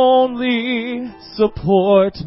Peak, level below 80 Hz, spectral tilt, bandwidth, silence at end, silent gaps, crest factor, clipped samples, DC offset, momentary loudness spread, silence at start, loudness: -2 dBFS; -44 dBFS; -11 dB/octave; 5.8 kHz; 0 s; none; 14 dB; under 0.1%; under 0.1%; 13 LU; 0 s; -16 LUFS